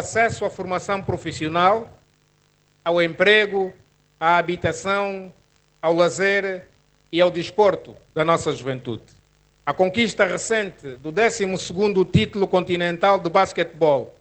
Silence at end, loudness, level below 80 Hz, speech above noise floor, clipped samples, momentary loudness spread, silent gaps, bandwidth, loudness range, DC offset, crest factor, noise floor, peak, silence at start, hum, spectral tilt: 0.1 s; -21 LUFS; -56 dBFS; 41 dB; under 0.1%; 11 LU; none; 9.2 kHz; 3 LU; under 0.1%; 20 dB; -61 dBFS; -2 dBFS; 0 s; none; -4.5 dB/octave